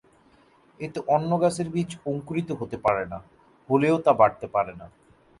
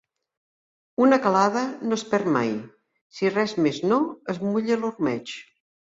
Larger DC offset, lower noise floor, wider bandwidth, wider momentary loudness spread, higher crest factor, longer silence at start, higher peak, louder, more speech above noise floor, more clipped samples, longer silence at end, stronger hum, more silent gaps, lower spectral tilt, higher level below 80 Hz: neither; second, -58 dBFS vs under -90 dBFS; first, 11.5 kHz vs 7.8 kHz; about the same, 14 LU vs 12 LU; about the same, 20 dB vs 20 dB; second, 0.8 s vs 1 s; about the same, -6 dBFS vs -6 dBFS; about the same, -25 LUFS vs -23 LUFS; second, 34 dB vs over 67 dB; neither; about the same, 0.55 s vs 0.5 s; neither; second, none vs 3.01-3.10 s; first, -7 dB/octave vs -5.5 dB/octave; first, -58 dBFS vs -68 dBFS